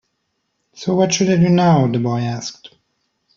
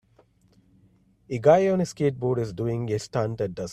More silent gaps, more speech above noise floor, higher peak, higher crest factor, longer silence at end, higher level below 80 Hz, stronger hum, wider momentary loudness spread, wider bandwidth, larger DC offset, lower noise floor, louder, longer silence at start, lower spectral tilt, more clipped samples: neither; first, 55 dB vs 37 dB; about the same, -2 dBFS vs -4 dBFS; about the same, 16 dB vs 20 dB; first, 0.7 s vs 0 s; about the same, -54 dBFS vs -58 dBFS; neither; first, 14 LU vs 10 LU; second, 7.4 kHz vs 13 kHz; neither; first, -71 dBFS vs -61 dBFS; first, -16 LUFS vs -25 LUFS; second, 0.8 s vs 1.3 s; about the same, -6 dB/octave vs -7 dB/octave; neither